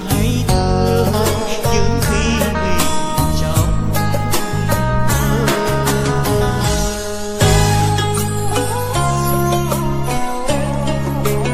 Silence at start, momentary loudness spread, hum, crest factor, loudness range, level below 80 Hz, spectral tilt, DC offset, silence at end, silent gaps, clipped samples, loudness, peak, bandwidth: 0 s; 4 LU; none; 14 dB; 1 LU; -24 dBFS; -5 dB/octave; under 0.1%; 0 s; none; under 0.1%; -17 LUFS; 0 dBFS; 16 kHz